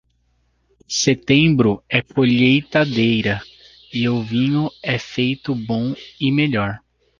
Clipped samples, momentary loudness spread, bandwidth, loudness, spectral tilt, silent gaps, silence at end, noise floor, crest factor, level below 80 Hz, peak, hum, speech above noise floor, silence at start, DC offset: under 0.1%; 10 LU; 7.4 kHz; -18 LUFS; -5 dB/octave; none; 0.45 s; -63 dBFS; 18 dB; -50 dBFS; -2 dBFS; none; 45 dB; 0.9 s; under 0.1%